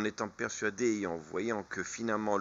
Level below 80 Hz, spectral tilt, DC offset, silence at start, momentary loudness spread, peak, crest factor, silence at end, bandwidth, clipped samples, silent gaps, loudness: -70 dBFS; -4 dB/octave; under 0.1%; 0 s; 5 LU; -16 dBFS; 20 dB; 0 s; 7.8 kHz; under 0.1%; none; -35 LUFS